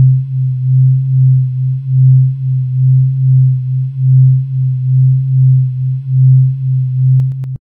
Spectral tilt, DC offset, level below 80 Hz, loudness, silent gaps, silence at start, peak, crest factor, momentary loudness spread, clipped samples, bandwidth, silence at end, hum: -13 dB/octave; under 0.1%; -46 dBFS; -11 LUFS; none; 0 s; -2 dBFS; 8 dB; 6 LU; under 0.1%; 0.3 kHz; 0.1 s; none